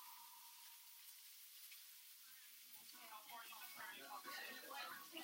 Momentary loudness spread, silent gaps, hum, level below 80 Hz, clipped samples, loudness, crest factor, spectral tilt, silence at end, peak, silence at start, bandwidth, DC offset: 7 LU; none; none; under -90 dBFS; under 0.1%; -55 LUFS; 18 dB; 0.5 dB/octave; 0 s; -40 dBFS; 0 s; 16 kHz; under 0.1%